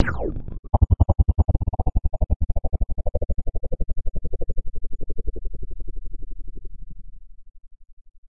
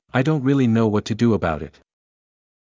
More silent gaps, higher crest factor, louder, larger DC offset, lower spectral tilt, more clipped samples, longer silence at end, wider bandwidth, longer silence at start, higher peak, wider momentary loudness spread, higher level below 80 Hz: first, 0.59-0.63 s, 2.36-2.40 s, 7.93-8.05 s, 8.18-8.23 s vs none; about the same, 22 dB vs 18 dB; second, -26 LUFS vs -20 LUFS; first, 4% vs under 0.1%; first, -10.5 dB/octave vs -7.5 dB/octave; neither; second, 0 s vs 0.95 s; second, 3 kHz vs 7.6 kHz; second, 0 s vs 0.15 s; about the same, -2 dBFS vs -4 dBFS; first, 24 LU vs 10 LU; first, -26 dBFS vs -44 dBFS